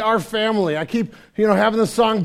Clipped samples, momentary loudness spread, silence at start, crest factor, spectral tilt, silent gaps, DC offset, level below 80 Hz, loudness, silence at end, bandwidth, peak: under 0.1%; 7 LU; 0 s; 18 dB; -5.5 dB/octave; none; under 0.1%; -54 dBFS; -19 LUFS; 0 s; 15.5 kHz; -2 dBFS